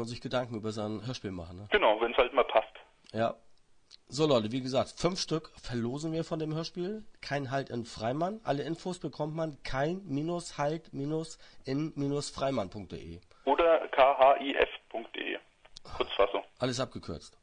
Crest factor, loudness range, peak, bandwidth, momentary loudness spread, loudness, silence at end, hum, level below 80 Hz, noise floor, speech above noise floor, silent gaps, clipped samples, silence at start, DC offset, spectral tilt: 22 dB; 7 LU; -8 dBFS; 10.5 kHz; 15 LU; -31 LUFS; 0.15 s; none; -56 dBFS; -58 dBFS; 26 dB; none; under 0.1%; 0 s; under 0.1%; -5 dB/octave